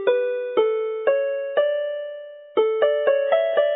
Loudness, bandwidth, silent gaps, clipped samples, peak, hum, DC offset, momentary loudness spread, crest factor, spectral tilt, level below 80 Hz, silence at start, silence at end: -22 LUFS; 3.9 kHz; none; under 0.1%; -6 dBFS; none; under 0.1%; 9 LU; 14 dB; -7 dB/octave; -78 dBFS; 0 s; 0 s